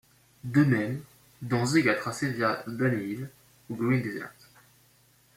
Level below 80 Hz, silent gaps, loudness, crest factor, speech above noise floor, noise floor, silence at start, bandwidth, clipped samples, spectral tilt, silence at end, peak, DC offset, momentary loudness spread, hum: -66 dBFS; none; -28 LUFS; 20 dB; 35 dB; -62 dBFS; 0.45 s; 16.5 kHz; under 0.1%; -6 dB/octave; 1.05 s; -10 dBFS; under 0.1%; 17 LU; none